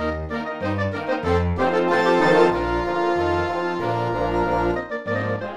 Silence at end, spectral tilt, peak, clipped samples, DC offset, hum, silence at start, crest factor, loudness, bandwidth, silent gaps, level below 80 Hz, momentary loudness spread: 0 s; -7 dB/octave; -4 dBFS; under 0.1%; under 0.1%; none; 0 s; 16 dB; -21 LUFS; 11 kHz; none; -38 dBFS; 9 LU